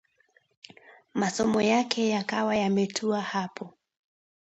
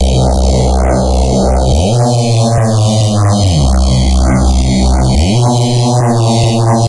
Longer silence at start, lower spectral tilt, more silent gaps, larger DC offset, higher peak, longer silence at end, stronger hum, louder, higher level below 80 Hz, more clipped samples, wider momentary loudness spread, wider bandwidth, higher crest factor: first, 0.9 s vs 0 s; second, -4.5 dB/octave vs -6 dB/octave; neither; second, under 0.1% vs 1%; second, -8 dBFS vs 0 dBFS; first, 0.8 s vs 0 s; neither; second, -27 LUFS vs -10 LUFS; second, -66 dBFS vs -14 dBFS; neither; first, 12 LU vs 1 LU; second, 8.6 kHz vs 11.5 kHz; first, 20 dB vs 10 dB